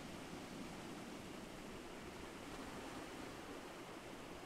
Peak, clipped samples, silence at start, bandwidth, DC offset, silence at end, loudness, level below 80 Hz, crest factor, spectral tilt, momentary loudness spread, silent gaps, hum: -38 dBFS; under 0.1%; 0 s; 16 kHz; under 0.1%; 0 s; -51 LUFS; -66 dBFS; 14 dB; -4 dB/octave; 2 LU; none; none